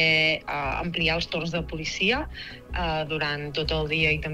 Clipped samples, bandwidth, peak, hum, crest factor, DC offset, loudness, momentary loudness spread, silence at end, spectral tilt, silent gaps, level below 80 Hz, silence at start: under 0.1%; 13 kHz; -8 dBFS; none; 18 dB; under 0.1%; -25 LUFS; 8 LU; 0 s; -4.5 dB/octave; none; -40 dBFS; 0 s